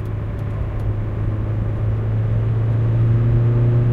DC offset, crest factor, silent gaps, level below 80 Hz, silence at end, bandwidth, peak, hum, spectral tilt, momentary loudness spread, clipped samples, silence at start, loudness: under 0.1%; 10 dB; none; -28 dBFS; 0 s; 3.6 kHz; -8 dBFS; none; -10.5 dB/octave; 8 LU; under 0.1%; 0 s; -20 LUFS